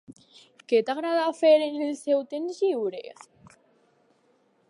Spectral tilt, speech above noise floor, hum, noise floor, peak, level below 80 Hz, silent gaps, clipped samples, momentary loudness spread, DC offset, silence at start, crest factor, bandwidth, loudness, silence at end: -4 dB/octave; 41 dB; none; -66 dBFS; -10 dBFS; -80 dBFS; none; under 0.1%; 13 LU; under 0.1%; 0.1 s; 18 dB; 11.5 kHz; -25 LUFS; 1.6 s